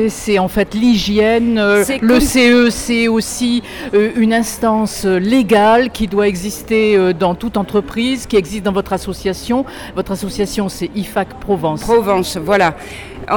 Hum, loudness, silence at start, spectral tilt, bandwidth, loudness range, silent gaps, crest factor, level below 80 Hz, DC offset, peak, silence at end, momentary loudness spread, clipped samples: none; -15 LUFS; 0 s; -4.5 dB/octave; 19 kHz; 6 LU; none; 12 dB; -36 dBFS; under 0.1%; -2 dBFS; 0 s; 10 LU; under 0.1%